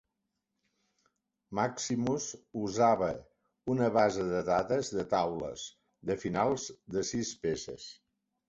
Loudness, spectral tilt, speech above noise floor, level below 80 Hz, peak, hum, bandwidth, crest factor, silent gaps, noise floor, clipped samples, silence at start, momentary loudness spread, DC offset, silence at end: -32 LUFS; -5 dB/octave; 53 dB; -62 dBFS; -12 dBFS; none; 8.2 kHz; 20 dB; none; -85 dBFS; under 0.1%; 1.5 s; 15 LU; under 0.1%; 0.55 s